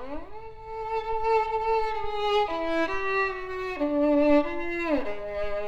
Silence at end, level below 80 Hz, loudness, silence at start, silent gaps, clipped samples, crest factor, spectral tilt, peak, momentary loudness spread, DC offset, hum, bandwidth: 0 s; -46 dBFS; -27 LUFS; 0 s; none; under 0.1%; 16 dB; -5.5 dB/octave; -10 dBFS; 13 LU; under 0.1%; none; 8 kHz